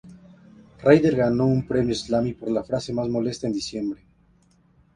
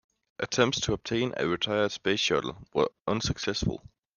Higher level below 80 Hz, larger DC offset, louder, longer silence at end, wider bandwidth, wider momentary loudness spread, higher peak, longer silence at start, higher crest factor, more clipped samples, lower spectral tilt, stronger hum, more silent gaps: about the same, -50 dBFS vs -50 dBFS; neither; first, -23 LUFS vs -28 LUFS; first, 1 s vs 0.4 s; about the same, 10.5 kHz vs 10 kHz; first, 11 LU vs 6 LU; first, -2 dBFS vs -8 dBFS; second, 0.05 s vs 0.4 s; about the same, 22 dB vs 22 dB; neither; first, -6.5 dB/octave vs -4 dB/octave; neither; neither